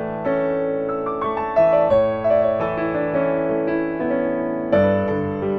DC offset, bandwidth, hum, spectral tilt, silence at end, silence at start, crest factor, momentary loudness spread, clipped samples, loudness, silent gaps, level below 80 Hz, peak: under 0.1%; 5.8 kHz; none; -9.5 dB/octave; 0 s; 0 s; 14 dB; 7 LU; under 0.1%; -20 LUFS; none; -48 dBFS; -4 dBFS